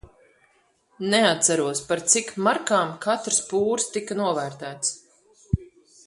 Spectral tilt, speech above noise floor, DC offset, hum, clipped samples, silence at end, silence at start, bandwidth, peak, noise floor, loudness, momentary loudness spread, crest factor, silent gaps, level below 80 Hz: -3 dB/octave; 40 dB; under 0.1%; none; under 0.1%; 0.4 s; 0.05 s; 11.5 kHz; -4 dBFS; -64 dBFS; -23 LUFS; 10 LU; 22 dB; none; -48 dBFS